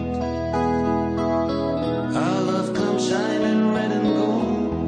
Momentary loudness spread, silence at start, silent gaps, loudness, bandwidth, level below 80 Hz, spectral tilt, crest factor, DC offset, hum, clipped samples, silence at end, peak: 3 LU; 0 s; none; -22 LUFS; 10 kHz; -42 dBFS; -6.5 dB/octave; 12 dB; under 0.1%; none; under 0.1%; 0 s; -8 dBFS